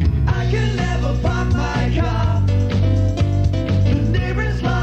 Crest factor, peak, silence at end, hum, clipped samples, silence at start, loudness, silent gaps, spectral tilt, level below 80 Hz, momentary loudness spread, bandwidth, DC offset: 10 dB; -6 dBFS; 0 s; none; under 0.1%; 0 s; -19 LUFS; none; -7.5 dB/octave; -24 dBFS; 2 LU; 8 kHz; under 0.1%